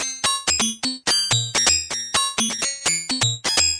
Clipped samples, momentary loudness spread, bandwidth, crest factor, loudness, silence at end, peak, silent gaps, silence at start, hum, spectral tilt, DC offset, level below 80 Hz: under 0.1%; 4 LU; 11 kHz; 20 dB; -19 LUFS; 0 s; -2 dBFS; none; 0 s; none; -1 dB/octave; under 0.1%; -48 dBFS